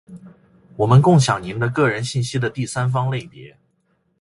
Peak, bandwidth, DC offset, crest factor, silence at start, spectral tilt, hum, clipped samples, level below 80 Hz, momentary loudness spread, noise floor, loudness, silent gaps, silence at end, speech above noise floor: -2 dBFS; 11.5 kHz; under 0.1%; 18 dB; 0.1 s; -6 dB/octave; none; under 0.1%; -50 dBFS; 11 LU; -66 dBFS; -19 LUFS; none; 0.75 s; 48 dB